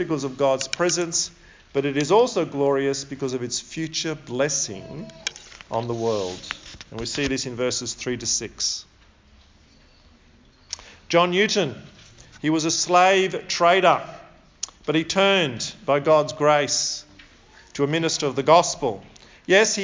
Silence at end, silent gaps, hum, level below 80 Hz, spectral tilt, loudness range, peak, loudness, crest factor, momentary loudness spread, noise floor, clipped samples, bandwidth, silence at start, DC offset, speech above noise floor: 0 s; none; none; -54 dBFS; -3 dB/octave; 7 LU; -2 dBFS; -22 LUFS; 22 dB; 16 LU; -54 dBFS; under 0.1%; 7.8 kHz; 0 s; under 0.1%; 32 dB